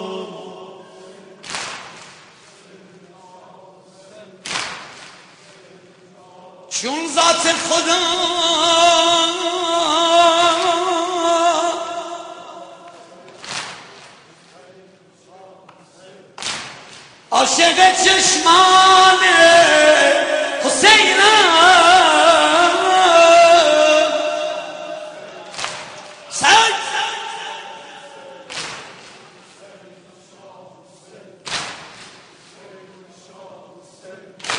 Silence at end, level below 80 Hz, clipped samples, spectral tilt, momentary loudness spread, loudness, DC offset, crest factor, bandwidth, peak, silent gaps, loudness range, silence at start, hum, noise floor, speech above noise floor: 0 s; -58 dBFS; under 0.1%; -0.5 dB/octave; 23 LU; -13 LUFS; under 0.1%; 16 dB; 10.5 kHz; 0 dBFS; none; 24 LU; 0 s; none; -49 dBFS; 34 dB